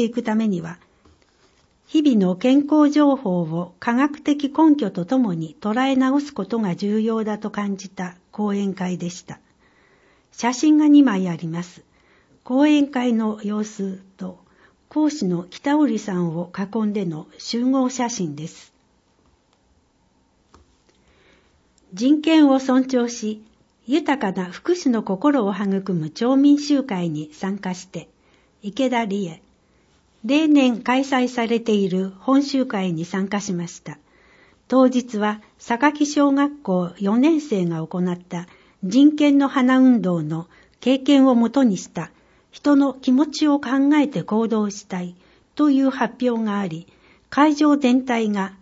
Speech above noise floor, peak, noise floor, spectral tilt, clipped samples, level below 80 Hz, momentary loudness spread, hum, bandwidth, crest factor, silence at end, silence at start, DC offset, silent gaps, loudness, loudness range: 42 dB; -2 dBFS; -62 dBFS; -6 dB/octave; under 0.1%; -64 dBFS; 14 LU; none; 8 kHz; 18 dB; 0.1 s; 0 s; under 0.1%; none; -20 LUFS; 6 LU